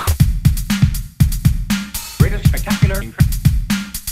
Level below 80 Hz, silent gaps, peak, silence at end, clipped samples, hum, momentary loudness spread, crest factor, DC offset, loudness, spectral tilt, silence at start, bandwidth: -22 dBFS; none; 0 dBFS; 0 s; under 0.1%; none; 6 LU; 16 dB; under 0.1%; -17 LUFS; -5.5 dB/octave; 0 s; 16.5 kHz